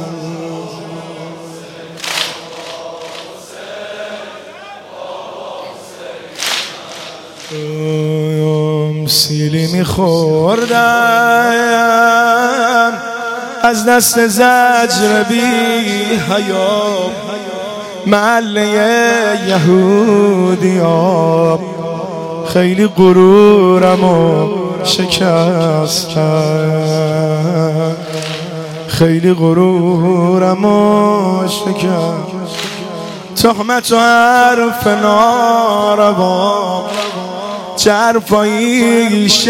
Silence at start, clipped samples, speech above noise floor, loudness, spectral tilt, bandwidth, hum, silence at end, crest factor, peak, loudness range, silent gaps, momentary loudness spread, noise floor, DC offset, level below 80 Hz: 0 s; under 0.1%; 21 dB; -11 LUFS; -5 dB/octave; 16.5 kHz; none; 0 s; 12 dB; 0 dBFS; 13 LU; none; 18 LU; -32 dBFS; under 0.1%; -48 dBFS